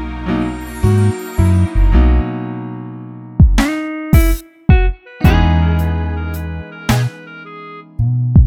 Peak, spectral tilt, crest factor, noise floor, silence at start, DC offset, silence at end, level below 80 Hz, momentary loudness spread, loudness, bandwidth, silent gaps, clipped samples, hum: 0 dBFS; -7 dB/octave; 14 dB; -33 dBFS; 0 s; under 0.1%; 0 s; -18 dBFS; 16 LU; -15 LUFS; 17.5 kHz; none; under 0.1%; none